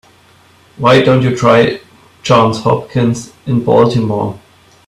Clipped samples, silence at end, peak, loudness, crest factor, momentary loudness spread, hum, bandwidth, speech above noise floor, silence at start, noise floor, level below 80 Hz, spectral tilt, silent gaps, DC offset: under 0.1%; 0.5 s; 0 dBFS; -12 LUFS; 12 dB; 11 LU; none; 12 kHz; 35 dB; 0.8 s; -46 dBFS; -46 dBFS; -6.5 dB/octave; none; under 0.1%